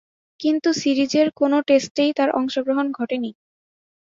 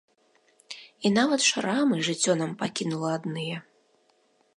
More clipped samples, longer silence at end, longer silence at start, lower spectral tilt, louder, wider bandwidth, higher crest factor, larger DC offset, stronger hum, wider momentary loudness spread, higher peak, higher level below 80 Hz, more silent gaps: neither; about the same, 0.85 s vs 0.95 s; second, 0.4 s vs 0.7 s; about the same, -4 dB/octave vs -3.5 dB/octave; first, -20 LUFS vs -26 LUFS; second, 7.6 kHz vs 11.5 kHz; about the same, 16 dB vs 18 dB; neither; neither; second, 8 LU vs 16 LU; first, -6 dBFS vs -10 dBFS; first, -68 dBFS vs -74 dBFS; first, 1.91-1.95 s vs none